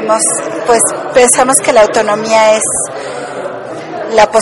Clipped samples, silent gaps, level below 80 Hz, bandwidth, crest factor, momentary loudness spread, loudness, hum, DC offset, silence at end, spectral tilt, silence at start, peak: 0.4%; none; -46 dBFS; 18.5 kHz; 10 dB; 14 LU; -9 LUFS; none; under 0.1%; 0 s; -2 dB/octave; 0 s; 0 dBFS